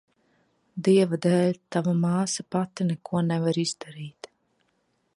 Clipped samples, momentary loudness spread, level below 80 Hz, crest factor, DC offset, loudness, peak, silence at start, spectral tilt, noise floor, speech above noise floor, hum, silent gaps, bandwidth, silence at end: under 0.1%; 17 LU; -70 dBFS; 18 dB; under 0.1%; -25 LUFS; -8 dBFS; 0.75 s; -6 dB/octave; -72 dBFS; 47 dB; none; none; 11.5 kHz; 1.05 s